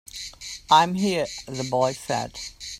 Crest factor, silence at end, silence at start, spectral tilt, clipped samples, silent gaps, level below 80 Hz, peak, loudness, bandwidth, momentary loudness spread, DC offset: 22 dB; 0 s; 0.15 s; -4 dB/octave; under 0.1%; none; -54 dBFS; -4 dBFS; -23 LUFS; 16 kHz; 16 LU; under 0.1%